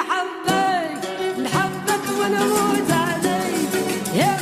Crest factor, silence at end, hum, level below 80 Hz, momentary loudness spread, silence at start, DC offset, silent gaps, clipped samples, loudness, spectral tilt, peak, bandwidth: 14 dB; 0 s; none; -58 dBFS; 5 LU; 0 s; under 0.1%; none; under 0.1%; -21 LUFS; -4 dB/octave; -6 dBFS; 15.5 kHz